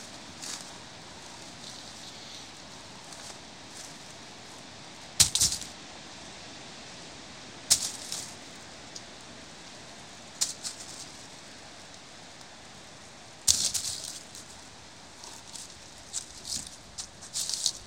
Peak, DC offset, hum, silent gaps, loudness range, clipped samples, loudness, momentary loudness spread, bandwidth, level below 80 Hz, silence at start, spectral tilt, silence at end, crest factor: -2 dBFS; 0.1%; none; none; 13 LU; under 0.1%; -31 LUFS; 21 LU; 16 kHz; -60 dBFS; 0 s; 0 dB/octave; 0 s; 34 dB